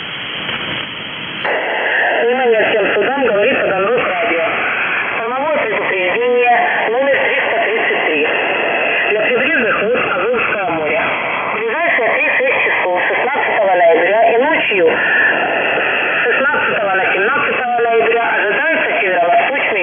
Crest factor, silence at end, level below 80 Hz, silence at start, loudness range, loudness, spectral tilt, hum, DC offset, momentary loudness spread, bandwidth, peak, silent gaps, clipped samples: 12 dB; 0 s; -58 dBFS; 0 s; 2 LU; -13 LUFS; -7 dB/octave; none; under 0.1%; 5 LU; 3.7 kHz; -2 dBFS; none; under 0.1%